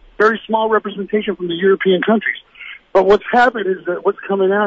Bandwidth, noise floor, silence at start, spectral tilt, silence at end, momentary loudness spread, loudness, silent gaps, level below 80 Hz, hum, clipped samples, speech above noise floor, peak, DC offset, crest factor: 7.6 kHz; -37 dBFS; 0.2 s; -6.5 dB/octave; 0 s; 8 LU; -16 LUFS; none; -50 dBFS; none; under 0.1%; 21 dB; -2 dBFS; under 0.1%; 12 dB